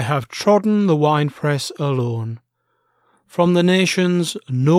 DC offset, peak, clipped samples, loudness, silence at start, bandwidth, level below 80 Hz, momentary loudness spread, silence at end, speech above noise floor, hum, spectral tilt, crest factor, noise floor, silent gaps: under 0.1%; -2 dBFS; under 0.1%; -18 LUFS; 0 s; 15 kHz; -66 dBFS; 10 LU; 0 s; 51 dB; none; -6 dB/octave; 16 dB; -68 dBFS; none